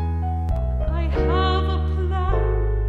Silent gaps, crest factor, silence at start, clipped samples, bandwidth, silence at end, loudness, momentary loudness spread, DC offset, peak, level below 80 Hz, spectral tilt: none; 12 dB; 0 s; under 0.1%; 4.6 kHz; 0 s; -23 LUFS; 4 LU; under 0.1%; -8 dBFS; -22 dBFS; -8.5 dB/octave